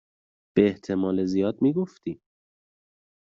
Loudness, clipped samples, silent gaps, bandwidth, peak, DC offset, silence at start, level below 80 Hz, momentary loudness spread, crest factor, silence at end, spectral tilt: -25 LUFS; under 0.1%; none; 7.4 kHz; -6 dBFS; under 0.1%; 0.55 s; -64 dBFS; 14 LU; 22 dB; 1.25 s; -7.5 dB/octave